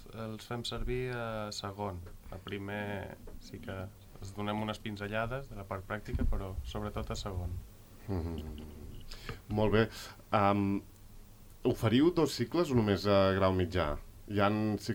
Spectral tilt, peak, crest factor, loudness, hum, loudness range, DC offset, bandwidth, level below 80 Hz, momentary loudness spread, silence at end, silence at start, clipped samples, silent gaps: -6.5 dB/octave; -14 dBFS; 20 dB; -34 LUFS; none; 10 LU; under 0.1%; 19 kHz; -46 dBFS; 19 LU; 0 s; 0 s; under 0.1%; none